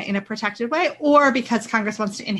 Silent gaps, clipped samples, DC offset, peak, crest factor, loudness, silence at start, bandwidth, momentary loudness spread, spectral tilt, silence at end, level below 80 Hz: none; under 0.1%; under 0.1%; -4 dBFS; 16 dB; -20 LUFS; 0 s; 12 kHz; 10 LU; -4.5 dB/octave; 0 s; -64 dBFS